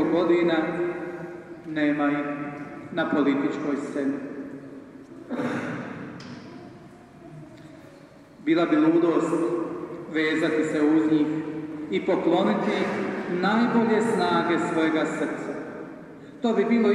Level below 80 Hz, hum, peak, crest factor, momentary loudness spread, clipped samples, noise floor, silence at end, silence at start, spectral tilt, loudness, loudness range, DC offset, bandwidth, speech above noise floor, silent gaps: -66 dBFS; none; -10 dBFS; 16 dB; 20 LU; under 0.1%; -48 dBFS; 0 s; 0 s; -6.5 dB/octave; -25 LUFS; 12 LU; under 0.1%; 11 kHz; 25 dB; none